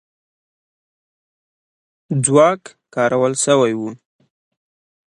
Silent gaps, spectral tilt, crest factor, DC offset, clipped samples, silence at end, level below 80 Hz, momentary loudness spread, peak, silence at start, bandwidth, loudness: none; -4.5 dB/octave; 20 dB; under 0.1%; under 0.1%; 1.15 s; -64 dBFS; 15 LU; 0 dBFS; 2.1 s; 11.5 kHz; -16 LUFS